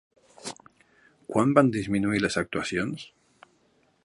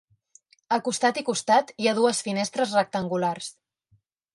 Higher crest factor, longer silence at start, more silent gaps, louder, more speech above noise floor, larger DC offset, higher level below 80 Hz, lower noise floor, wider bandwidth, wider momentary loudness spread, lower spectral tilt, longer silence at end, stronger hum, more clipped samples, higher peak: first, 24 dB vs 18 dB; second, 0.45 s vs 0.7 s; neither; about the same, -25 LUFS vs -25 LUFS; about the same, 41 dB vs 42 dB; neither; first, -58 dBFS vs -72 dBFS; about the same, -66 dBFS vs -66 dBFS; about the same, 11.5 kHz vs 11.5 kHz; first, 22 LU vs 6 LU; first, -5.5 dB/octave vs -3.5 dB/octave; first, 1 s vs 0.85 s; neither; neither; first, -4 dBFS vs -8 dBFS